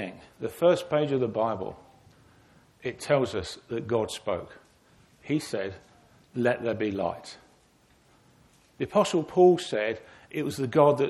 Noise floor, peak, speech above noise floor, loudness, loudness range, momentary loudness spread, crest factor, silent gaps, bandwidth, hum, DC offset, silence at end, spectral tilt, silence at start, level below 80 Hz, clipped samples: -62 dBFS; -8 dBFS; 36 dB; -27 LUFS; 5 LU; 16 LU; 22 dB; none; 13.5 kHz; none; under 0.1%; 0 s; -6 dB/octave; 0 s; -62 dBFS; under 0.1%